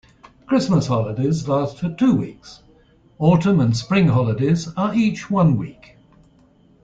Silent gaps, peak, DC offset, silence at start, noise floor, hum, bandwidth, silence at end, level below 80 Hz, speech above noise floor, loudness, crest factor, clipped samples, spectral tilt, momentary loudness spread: none; -4 dBFS; under 0.1%; 0.5 s; -54 dBFS; none; 7.8 kHz; 1.1 s; -50 dBFS; 35 dB; -19 LUFS; 16 dB; under 0.1%; -7.5 dB/octave; 6 LU